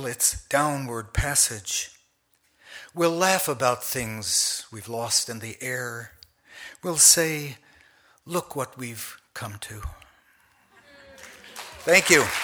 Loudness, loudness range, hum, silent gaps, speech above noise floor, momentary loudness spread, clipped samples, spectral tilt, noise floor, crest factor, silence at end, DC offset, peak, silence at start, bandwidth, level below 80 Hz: -22 LUFS; 13 LU; none; none; 43 dB; 23 LU; under 0.1%; -2 dB/octave; -67 dBFS; 22 dB; 0 s; under 0.1%; -4 dBFS; 0 s; over 20 kHz; -46 dBFS